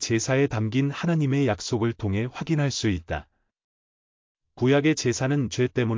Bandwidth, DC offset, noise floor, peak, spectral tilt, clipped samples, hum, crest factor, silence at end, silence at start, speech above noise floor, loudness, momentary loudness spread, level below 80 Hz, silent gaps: 7.6 kHz; under 0.1%; under -90 dBFS; -10 dBFS; -5.5 dB/octave; under 0.1%; none; 14 dB; 0 s; 0 s; over 66 dB; -25 LUFS; 6 LU; -48 dBFS; 3.64-4.35 s